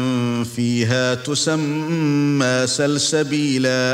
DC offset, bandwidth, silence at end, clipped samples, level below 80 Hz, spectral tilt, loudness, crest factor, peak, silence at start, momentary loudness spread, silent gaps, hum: under 0.1%; 16 kHz; 0 s; under 0.1%; -60 dBFS; -4.5 dB/octave; -19 LUFS; 14 dB; -6 dBFS; 0 s; 4 LU; none; none